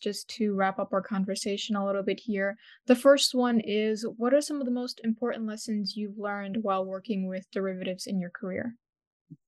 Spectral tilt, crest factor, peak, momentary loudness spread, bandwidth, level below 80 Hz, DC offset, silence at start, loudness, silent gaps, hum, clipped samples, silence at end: -4.5 dB/octave; 20 dB; -8 dBFS; 11 LU; 12.5 kHz; -80 dBFS; under 0.1%; 0 s; -29 LUFS; 8.89-8.93 s, 9.07-9.25 s; none; under 0.1%; 0.15 s